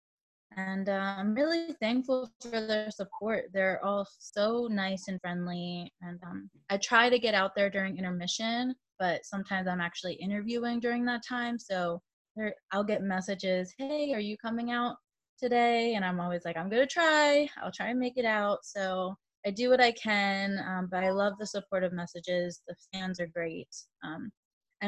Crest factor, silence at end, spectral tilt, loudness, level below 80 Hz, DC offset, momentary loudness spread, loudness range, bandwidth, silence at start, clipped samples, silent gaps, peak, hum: 22 dB; 0 s; -4.5 dB/octave; -31 LUFS; -72 dBFS; under 0.1%; 13 LU; 5 LU; 9.8 kHz; 0.5 s; under 0.1%; 2.35-2.40 s, 12.13-12.25 s, 12.31-12.35 s, 12.63-12.68 s, 15.29-15.37 s, 19.37-19.43 s, 24.37-24.61 s; -10 dBFS; none